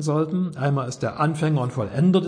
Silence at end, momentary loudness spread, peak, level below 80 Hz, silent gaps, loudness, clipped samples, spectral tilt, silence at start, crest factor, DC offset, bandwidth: 0 s; 4 LU; -8 dBFS; -58 dBFS; none; -23 LUFS; under 0.1%; -7.5 dB/octave; 0 s; 14 dB; under 0.1%; 10.5 kHz